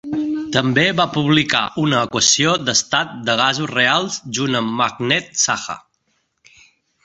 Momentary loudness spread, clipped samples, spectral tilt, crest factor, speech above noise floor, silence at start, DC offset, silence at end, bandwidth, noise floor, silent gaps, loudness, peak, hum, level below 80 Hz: 7 LU; under 0.1%; -3 dB/octave; 18 dB; 49 dB; 0.05 s; under 0.1%; 1.25 s; 8.2 kHz; -67 dBFS; none; -17 LUFS; 0 dBFS; none; -54 dBFS